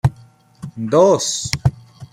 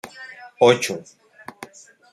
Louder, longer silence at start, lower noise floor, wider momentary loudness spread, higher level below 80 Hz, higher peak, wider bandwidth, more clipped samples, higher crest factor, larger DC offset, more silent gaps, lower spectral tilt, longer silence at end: about the same, -17 LUFS vs -18 LUFS; about the same, 0.05 s vs 0.05 s; first, -47 dBFS vs -43 dBFS; second, 19 LU vs 25 LU; first, -40 dBFS vs -66 dBFS; about the same, 0 dBFS vs 0 dBFS; first, 16 kHz vs 13 kHz; neither; about the same, 18 dB vs 22 dB; neither; neither; about the same, -5 dB/octave vs -4 dB/octave; second, 0.05 s vs 0.5 s